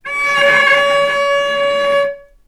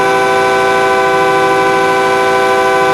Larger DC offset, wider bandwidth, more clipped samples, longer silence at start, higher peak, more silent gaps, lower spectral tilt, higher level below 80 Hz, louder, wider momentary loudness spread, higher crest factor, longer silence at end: neither; about the same, 14.5 kHz vs 15 kHz; neither; about the same, 0.05 s vs 0 s; about the same, 0 dBFS vs 0 dBFS; neither; second, -1.5 dB/octave vs -3.5 dB/octave; about the same, -50 dBFS vs -46 dBFS; about the same, -12 LUFS vs -10 LUFS; first, 6 LU vs 0 LU; about the same, 14 dB vs 10 dB; first, 0.25 s vs 0 s